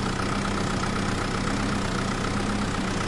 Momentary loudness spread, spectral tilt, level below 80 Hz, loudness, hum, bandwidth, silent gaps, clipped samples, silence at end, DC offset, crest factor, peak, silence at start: 1 LU; -5 dB/octave; -36 dBFS; -27 LUFS; none; 11.5 kHz; none; under 0.1%; 0 s; under 0.1%; 14 dB; -12 dBFS; 0 s